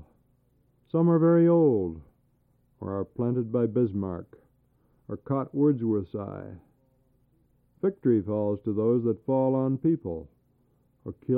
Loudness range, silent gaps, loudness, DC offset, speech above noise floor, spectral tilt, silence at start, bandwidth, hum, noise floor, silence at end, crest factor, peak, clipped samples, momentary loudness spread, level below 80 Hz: 6 LU; none; -26 LUFS; under 0.1%; 42 dB; -13.5 dB/octave; 0.95 s; 3.6 kHz; 60 Hz at -50 dBFS; -67 dBFS; 0 s; 16 dB; -12 dBFS; under 0.1%; 19 LU; -62 dBFS